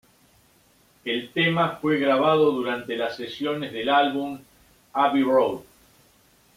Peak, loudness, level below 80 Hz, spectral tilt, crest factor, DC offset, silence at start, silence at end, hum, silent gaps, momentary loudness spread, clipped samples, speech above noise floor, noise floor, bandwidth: -8 dBFS; -23 LUFS; -64 dBFS; -6 dB/octave; 16 dB; under 0.1%; 1.05 s; 0.95 s; none; none; 11 LU; under 0.1%; 37 dB; -59 dBFS; 16 kHz